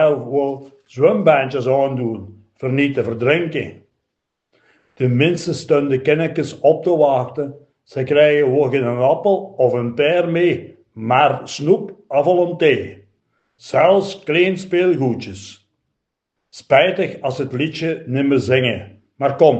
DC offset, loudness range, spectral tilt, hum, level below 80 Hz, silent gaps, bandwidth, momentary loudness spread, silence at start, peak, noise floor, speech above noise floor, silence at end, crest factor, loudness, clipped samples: under 0.1%; 4 LU; -6.5 dB/octave; none; -62 dBFS; none; 8.6 kHz; 12 LU; 0 s; 0 dBFS; -78 dBFS; 61 dB; 0 s; 18 dB; -17 LUFS; under 0.1%